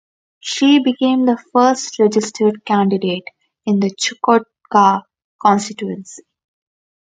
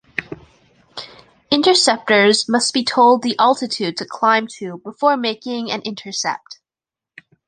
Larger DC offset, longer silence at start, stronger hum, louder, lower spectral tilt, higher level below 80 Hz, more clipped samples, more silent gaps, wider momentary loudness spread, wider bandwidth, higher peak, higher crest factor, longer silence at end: neither; first, 0.45 s vs 0.2 s; neither; about the same, -16 LUFS vs -16 LUFS; first, -4.5 dB/octave vs -2.5 dB/octave; about the same, -66 dBFS vs -62 dBFS; neither; first, 5.24-5.39 s vs none; second, 12 LU vs 21 LU; about the same, 9.4 kHz vs 10 kHz; about the same, 0 dBFS vs 0 dBFS; about the same, 16 dB vs 18 dB; about the same, 0.85 s vs 0.95 s